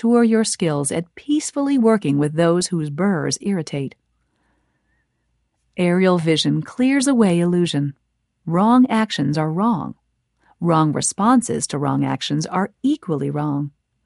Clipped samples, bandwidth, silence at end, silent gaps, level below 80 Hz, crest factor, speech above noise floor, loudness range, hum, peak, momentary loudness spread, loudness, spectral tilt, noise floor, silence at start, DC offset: under 0.1%; 11.5 kHz; 0.35 s; none; -60 dBFS; 16 dB; 51 dB; 5 LU; none; -4 dBFS; 9 LU; -19 LUFS; -5.5 dB/octave; -69 dBFS; 0.05 s; under 0.1%